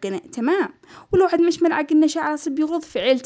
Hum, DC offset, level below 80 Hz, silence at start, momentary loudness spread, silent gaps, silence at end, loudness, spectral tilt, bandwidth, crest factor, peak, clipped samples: none; under 0.1%; -54 dBFS; 0 s; 6 LU; none; 0 s; -20 LUFS; -4.5 dB/octave; 8 kHz; 14 dB; -6 dBFS; under 0.1%